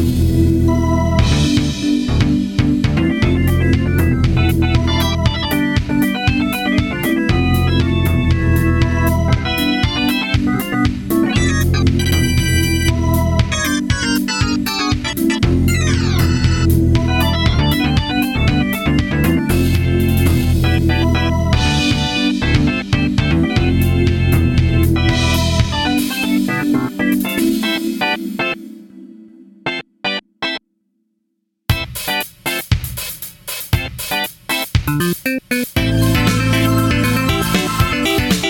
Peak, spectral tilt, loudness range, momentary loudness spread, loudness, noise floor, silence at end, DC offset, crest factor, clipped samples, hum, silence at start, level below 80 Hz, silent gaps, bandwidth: -2 dBFS; -5.5 dB/octave; 6 LU; 5 LU; -16 LUFS; -71 dBFS; 0 s; under 0.1%; 14 dB; under 0.1%; none; 0 s; -24 dBFS; none; 18.5 kHz